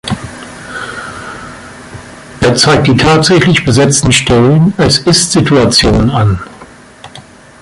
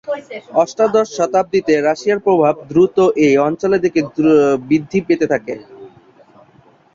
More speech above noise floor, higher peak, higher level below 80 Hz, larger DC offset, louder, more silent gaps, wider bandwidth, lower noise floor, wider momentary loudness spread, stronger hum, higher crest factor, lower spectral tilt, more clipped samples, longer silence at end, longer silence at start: second, 27 dB vs 35 dB; about the same, 0 dBFS vs -2 dBFS; first, -30 dBFS vs -56 dBFS; neither; first, -8 LUFS vs -15 LUFS; neither; first, 11.5 kHz vs 7.6 kHz; second, -35 dBFS vs -50 dBFS; first, 22 LU vs 7 LU; neither; about the same, 10 dB vs 14 dB; second, -4.5 dB/octave vs -6 dB/octave; neither; second, 0.4 s vs 1.05 s; about the same, 0.05 s vs 0.05 s